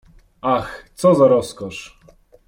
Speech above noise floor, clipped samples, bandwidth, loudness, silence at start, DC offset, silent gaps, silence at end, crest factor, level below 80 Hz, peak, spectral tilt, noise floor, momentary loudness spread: 33 dB; under 0.1%; 16 kHz; -17 LUFS; 0.45 s; under 0.1%; none; 0.6 s; 18 dB; -50 dBFS; -2 dBFS; -6.5 dB/octave; -51 dBFS; 18 LU